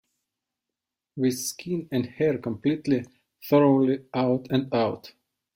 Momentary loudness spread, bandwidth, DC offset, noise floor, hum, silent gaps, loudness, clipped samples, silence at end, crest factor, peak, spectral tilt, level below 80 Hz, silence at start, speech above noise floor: 10 LU; 16.5 kHz; under 0.1%; -87 dBFS; none; none; -25 LUFS; under 0.1%; 0.45 s; 20 dB; -6 dBFS; -6 dB/octave; -64 dBFS; 1.15 s; 63 dB